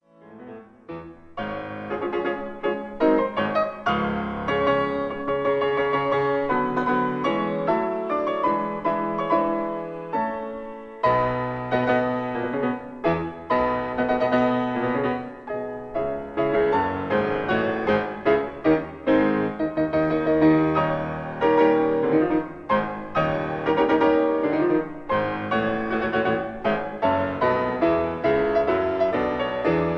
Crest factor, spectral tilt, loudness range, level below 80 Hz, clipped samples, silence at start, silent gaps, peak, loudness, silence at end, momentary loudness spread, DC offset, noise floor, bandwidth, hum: 16 dB; -8 dB/octave; 4 LU; -50 dBFS; under 0.1%; 0.25 s; none; -8 dBFS; -23 LUFS; 0 s; 8 LU; under 0.1%; -45 dBFS; 6.4 kHz; none